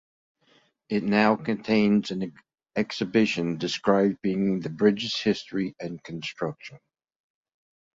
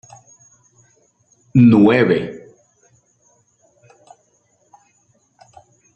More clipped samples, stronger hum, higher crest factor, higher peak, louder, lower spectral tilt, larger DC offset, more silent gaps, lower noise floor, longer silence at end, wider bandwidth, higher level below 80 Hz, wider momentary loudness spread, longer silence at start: neither; neither; about the same, 20 dB vs 18 dB; second, -6 dBFS vs -2 dBFS; second, -26 LUFS vs -13 LUFS; second, -6 dB/octave vs -8 dB/octave; neither; neither; about the same, -64 dBFS vs -61 dBFS; second, 1.2 s vs 3.6 s; about the same, 7.6 kHz vs 7.4 kHz; second, -64 dBFS vs -58 dBFS; second, 13 LU vs 20 LU; second, 0.9 s vs 1.55 s